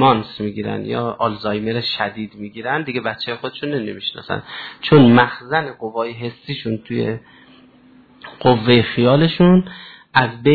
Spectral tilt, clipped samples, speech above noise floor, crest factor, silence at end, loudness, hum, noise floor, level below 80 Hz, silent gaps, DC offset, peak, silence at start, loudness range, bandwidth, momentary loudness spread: -9 dB/octave; under 0.1%; 31 dB; 18 dB; 0 s; -18 LUFS; none; -48 dBFS; -48 dBFS; none; under 0.1%; 0 dBFS; 0 s; 6 LU; 4.8 kHz; 14 LU